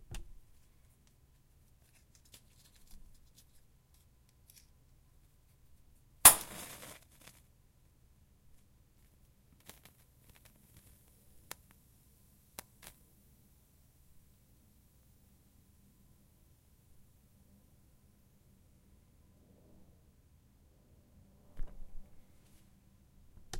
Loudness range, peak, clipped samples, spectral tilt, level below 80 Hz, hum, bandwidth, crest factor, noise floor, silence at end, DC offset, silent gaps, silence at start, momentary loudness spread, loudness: 27 LU; -4 dBFS; under 0.1%; 0 dB/octave; -58 dBFS; none; 16.5 kHz; 38 dB; -66 dBFS; 0 s; under 0.1%; none; 0.1 s; 35 LU; -24 LUFS